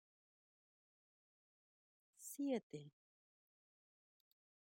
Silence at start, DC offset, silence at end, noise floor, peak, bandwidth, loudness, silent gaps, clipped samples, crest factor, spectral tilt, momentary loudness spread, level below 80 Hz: 2.2 s; under 0.1%; 1.85 s; under -90 dBFS; -30 dBFS; 16 kHz; -47 LUFS; 2.63-2.70 s; under 0.1%; 24 dB; -5 dB/octave; 14 LU; under -90 dBFS